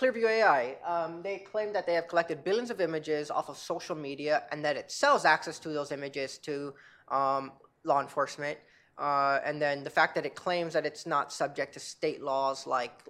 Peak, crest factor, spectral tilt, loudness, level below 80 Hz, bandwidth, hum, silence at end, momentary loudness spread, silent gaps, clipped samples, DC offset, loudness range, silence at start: -8 dBFS; 22 dB; -4 dB/octave; -31 LUFS; -80 dBFS; 14 kHz; none; 0.15 s; 11 LU; none; under 0.1%; under 0.1%; 2 LU; 0 s